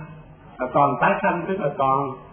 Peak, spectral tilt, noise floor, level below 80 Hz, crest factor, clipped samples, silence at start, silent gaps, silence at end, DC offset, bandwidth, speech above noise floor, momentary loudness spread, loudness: -4 dBFS; -11.5 dB/octave; -43 dBFS; -54 dBFS; 18 dB; under 0.1%; 0 s; none; 0 s; under 0.1%; 3.5 kHz; 22 dB; 9 LU; -21 LUFS